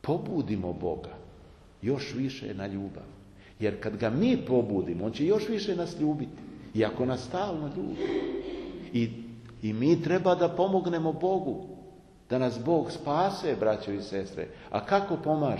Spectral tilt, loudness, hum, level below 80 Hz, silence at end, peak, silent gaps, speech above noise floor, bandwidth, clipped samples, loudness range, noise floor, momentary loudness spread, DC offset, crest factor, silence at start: -7 dB/octave; -30 LUFS; none; -56 dBFS; 0 s; -10 dBFS; none; 24 dB; 11.5 kHz; under 0.1%; 5 LU; -53 dBFS; 13 LU; under 0.1%; 20 dB; 0.05 s